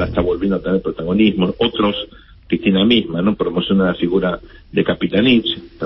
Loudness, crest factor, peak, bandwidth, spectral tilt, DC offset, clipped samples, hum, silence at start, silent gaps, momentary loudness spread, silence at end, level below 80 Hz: -17 LUFS; 16 dB; -2 dBFS; 5.8 kHz; -11.5 dB/octave; under 0.1%; under 0.1%; none; 0 s; none; 9 LU; 0 s; -38 dBFS